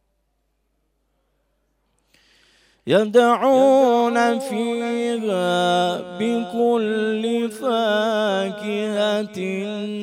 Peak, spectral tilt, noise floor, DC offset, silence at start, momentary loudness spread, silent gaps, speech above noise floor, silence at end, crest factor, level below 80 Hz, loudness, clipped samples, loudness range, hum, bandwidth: -4 dBFS; -5 dB/octave; -70 dBFS; under 0.1%; 2.85 s; 9 LU; none; 50 dB; 0 s; 16 dB; -70 dBFS; -20 LUFS; under 0.1%; 4 LU; none; 15.5 kHz